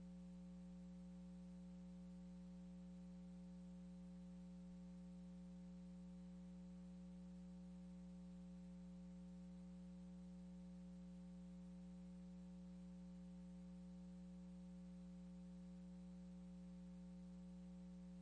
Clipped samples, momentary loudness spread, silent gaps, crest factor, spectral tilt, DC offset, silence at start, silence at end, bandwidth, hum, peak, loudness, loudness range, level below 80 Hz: under 0.1%; 0 LU; none; 6 dB; -8 dB/octave; under 0.1%; 0 s; 0 s; 9.6 kHz; 60 Hz at -60 dBFS; -50 dBFS; -59 LUFS; 0 LU; -70 dBFS